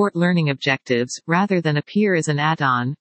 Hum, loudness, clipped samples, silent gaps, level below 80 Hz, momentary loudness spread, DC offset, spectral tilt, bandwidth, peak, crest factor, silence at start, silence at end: none; -20 LUFS; under 0.1%; none; -68 dBFS; 3 LU; under 0.1%; -5.5 dB/octave; 8.8 kHz; -2 dBFS; 18 dB; 0 s; 0.05 s